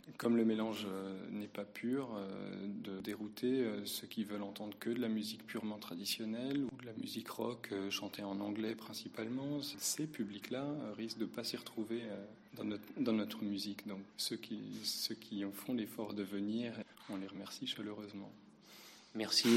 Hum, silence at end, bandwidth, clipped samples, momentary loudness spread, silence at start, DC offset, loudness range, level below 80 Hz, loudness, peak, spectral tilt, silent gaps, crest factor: none; 0 s; 16 kHz; under 0.1%; 10 LU; 0.05 s; under 0.1%; 2 LU; -82 dBFS; -41 LUFS; -16 dBFS; -4 dB/octave; none; 24 dB